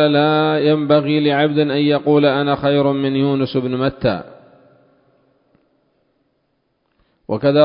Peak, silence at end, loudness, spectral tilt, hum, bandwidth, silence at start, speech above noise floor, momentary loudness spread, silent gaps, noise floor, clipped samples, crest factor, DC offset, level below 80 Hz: 0 dBFS; 0 s; -16 LUFS; -12 dB/octave; none; 5.4 kHz; 0 s; 52 dB; 6 LU; none; -67 dBFS; under 0.1%; 18 dB; under 0.1%; -52 dBFS